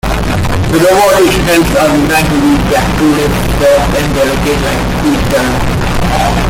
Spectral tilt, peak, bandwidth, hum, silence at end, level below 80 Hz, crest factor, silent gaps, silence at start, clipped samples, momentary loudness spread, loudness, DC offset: -5 dB/octave; 0 dBFS; 17 kHz; none; 0 s; -20 dBFS; 10 dB; none; 0.05 s; under 0.1%; 6 LU; -10 LUFS; under 0.1%